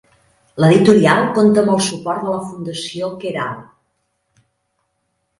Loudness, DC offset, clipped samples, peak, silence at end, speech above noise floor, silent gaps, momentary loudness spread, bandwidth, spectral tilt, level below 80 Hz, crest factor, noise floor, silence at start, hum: -16 LUFS; under 0.1%; under 0.1%; 0 dBFS; 1.8 s; 55 dB; none; 15 LU; 11.5 kHz; -5.5 dB/octave; -56 dBFS; 18 dB; -70 dBFS; 0.55 s; none